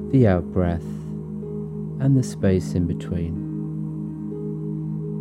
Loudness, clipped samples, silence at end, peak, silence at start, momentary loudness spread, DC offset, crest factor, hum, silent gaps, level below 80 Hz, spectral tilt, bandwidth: -25 LUFS; under 0.1%; 0 s; -6 dBFS; 0 s; 11 LU; under 0.1%; 18 dB; none; none; -48 dBFS; -8.5 dB/octave; 12 kHz